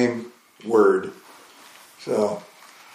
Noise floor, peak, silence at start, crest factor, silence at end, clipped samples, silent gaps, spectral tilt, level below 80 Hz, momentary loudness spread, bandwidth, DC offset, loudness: -48 dBFS; -6 dBFS; 0 s; 18 dB; 0.5 s; under 0.1%; none; -6 dB/octave; -76 dBFS; 20 LU; 15 kHz; under 0.1%; -22 LUFS